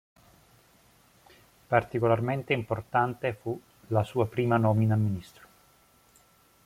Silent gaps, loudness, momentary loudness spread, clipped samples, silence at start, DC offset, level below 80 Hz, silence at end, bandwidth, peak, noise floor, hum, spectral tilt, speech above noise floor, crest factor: none; -28 LUFS; 10 LU; under 0.1%; 1.7 s; under 0.1%; -62 dBFS; 1.4 s; 15 kHz; -6 dBFS; -62 dBFS; none; -8 dB/octave; 35 dB; 22 dB